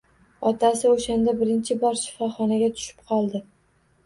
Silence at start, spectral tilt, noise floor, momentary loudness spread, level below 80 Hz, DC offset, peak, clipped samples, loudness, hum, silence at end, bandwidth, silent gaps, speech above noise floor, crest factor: 0.4 s; -5 dB/octave; -63 dBFS; 8 LU; -56 dBFS; under 0.1%; -8 dBFS; under 0.1%; -23 LUFS; none; 0.65 s; 11.5 kHz; none; 40 dB; 16 dB